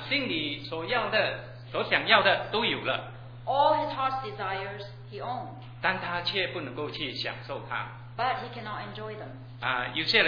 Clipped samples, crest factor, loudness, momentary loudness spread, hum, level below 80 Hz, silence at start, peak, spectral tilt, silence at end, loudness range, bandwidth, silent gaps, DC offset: under 0.1%; 26 dB; -29 LUFS; 15 LU; none; -58 dBFS; 0 s; -4 dBFS; -5.5 dB/octave; 0 s; 7 LU; 5.4 kHz; none; under 0.1%